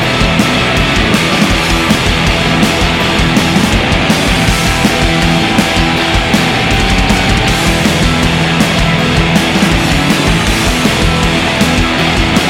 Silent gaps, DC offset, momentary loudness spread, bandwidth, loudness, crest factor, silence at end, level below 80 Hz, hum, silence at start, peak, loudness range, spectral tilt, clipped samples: none; under 0.1%; 1 LU; 17 kHz; -10 LUFS; 10 dB; 0 s; -20 dBFS; none; 0 s; 0 dBFS; 0 LU; -4.5 dB/octave; under 0.1%